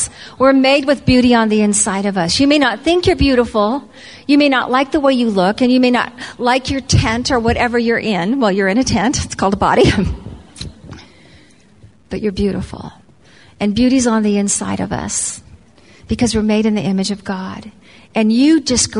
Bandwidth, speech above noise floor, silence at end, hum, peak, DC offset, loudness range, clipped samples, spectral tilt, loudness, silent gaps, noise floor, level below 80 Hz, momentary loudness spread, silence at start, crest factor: 11 kHz; 32 dB; 0 s; none; 0 dBFS; 0.2%; 6 LU; under 0.1%; -4.5 dB/octave; -14 LUFS; none; -46 dBFS; -34 dBFS; 13 LU; 0 s; 14 dB